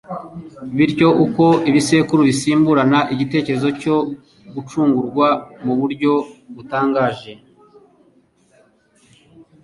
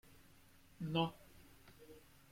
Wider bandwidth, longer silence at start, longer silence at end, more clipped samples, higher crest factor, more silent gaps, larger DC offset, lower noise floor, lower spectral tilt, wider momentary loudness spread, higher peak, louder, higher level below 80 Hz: second, 11.5 kHz vs 16.5 kHz; about the same, 0.1 s vs 0.1 s; first, 2.3 s vs 0.3 s; neither; second, 16 dB vs 24 dB; neither; neither; second, -56 dBFS vs -65 dBFS; about the same, -6 dB/octave vs -6.5 dB/octave; second, 18 LU vs 25 LU; first, -2 dBFS vs -22 dBFS; first, -16 LUFS vs -41 LUFS; first, -56 dBFS vs -70 dBFS